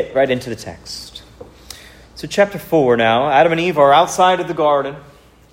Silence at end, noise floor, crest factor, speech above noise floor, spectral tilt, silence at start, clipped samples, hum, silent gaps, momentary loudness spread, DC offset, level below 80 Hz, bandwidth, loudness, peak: 0.55 s; -40 dBFS; 16 dB; 25 dB; -4.5 dB/octave; 0 s; under 0.1%; none; none; 24 LU; under 0.1%; -48 dBFS; 16 kHz; -15 LUFS; 0 dBFS